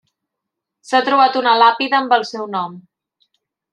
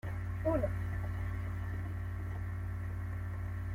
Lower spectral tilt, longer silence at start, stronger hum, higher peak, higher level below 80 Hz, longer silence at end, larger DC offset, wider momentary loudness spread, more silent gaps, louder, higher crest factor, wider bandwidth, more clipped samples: second, -3.5 dB/octave vs -9 dB/octave; first, 0.9 s vs 0.05 s; neither; first, -2 dBFS vs -20 dBFS; second, -76 dBFS vs -46 dBFS; first, 0.9 s vs 0 s; neither; first, 11 LU vs 6 LU; neither; first, -15 LUFS vs -38 LUFS; about the same, 16 dB vs 16 dB; second, 10.5 kHz vs 14.5 kHz; neither